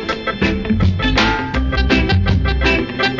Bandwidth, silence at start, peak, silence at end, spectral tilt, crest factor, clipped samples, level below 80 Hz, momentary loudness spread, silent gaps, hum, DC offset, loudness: 7.6 kHz; 0 s; -2 dBFS; 0 s; -6 dB/octave; 14 dB; under 0.1%; -22 dBFS; 4 LU; none; none; under 0.1%; -16 LUFS